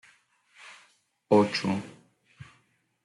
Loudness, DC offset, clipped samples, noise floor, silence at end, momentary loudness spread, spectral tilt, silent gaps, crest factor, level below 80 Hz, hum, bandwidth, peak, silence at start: -26 LUFS; under 0.1%; under 0.1%; -69 dBFS; 0.6 s; 26 LU; -6 dB/octave; none; 22 dB; -72 dBFS; none; 11.5 kHz; -8 dBFS; 0.65 s